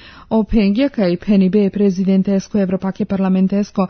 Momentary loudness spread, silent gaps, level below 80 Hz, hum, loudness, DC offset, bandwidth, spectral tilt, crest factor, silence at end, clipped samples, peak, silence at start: 5 LU; none; -36 dBFS; none; -16 LUFS; under 0.1%; 6.6 kHz; -8 dB/octave; 12 dB; 0 s; under 0.1%; -4 dBFS; 0.05 s